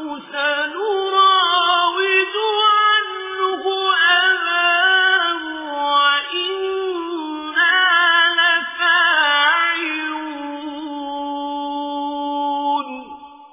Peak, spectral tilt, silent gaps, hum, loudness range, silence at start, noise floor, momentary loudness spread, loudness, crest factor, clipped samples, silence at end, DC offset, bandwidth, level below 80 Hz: -4 dBFS; -3.5 dB/octave; none; none; 7 LU; 0 s; -38 dBFS; 13 LU; -16 LUFS; 14 dB; under 0.1%; 0.05 s; under 0.1%; 3.9 kHz; -66 dBFS